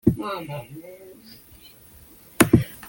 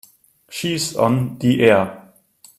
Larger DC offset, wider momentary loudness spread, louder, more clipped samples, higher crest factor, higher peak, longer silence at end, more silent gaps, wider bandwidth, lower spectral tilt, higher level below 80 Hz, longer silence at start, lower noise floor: neither; first, 27 LU vs 13 LU; second, -22 LUFS vs -18 LUFS; neither; first, 26 dB vs 20 dB; about the same, 0 dBFS vs 0 dBFS; second, 0 s vs 0.6 s; neither; about the same, 17 kHz vs 15.5 kHz; about the same, -5.5 dB/octave vs -5.5 dB/octave; first, -46 dBFS vs -56 dBFS; second, 0.05 s vs 0.5 s; about the same, -49 dBFS vs -51 dBFS